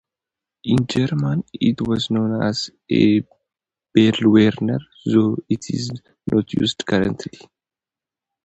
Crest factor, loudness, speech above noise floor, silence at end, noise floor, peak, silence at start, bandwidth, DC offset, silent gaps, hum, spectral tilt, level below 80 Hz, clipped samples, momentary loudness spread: 20 dB; -19 LUFS; 71 dB; 1.2 s; -89 dBFS; 0 dBFS; 0.65 s; 8.2 kHz; under 0.1%; none; none; -6.5 dB/octave; -52 dBFS; under 0.1%; 11 LU